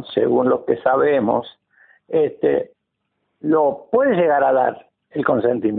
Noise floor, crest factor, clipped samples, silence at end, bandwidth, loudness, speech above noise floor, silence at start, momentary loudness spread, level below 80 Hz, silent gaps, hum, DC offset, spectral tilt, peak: -74 dBFS; 16 dB; under 0.1%; 0 s; 4.2 kHz; -18 LUFS; 57 dB; 0 s; 8 LU; -60 dBFS; none; none; under 0.1%; -11.5 dB/octave; -2 dBFS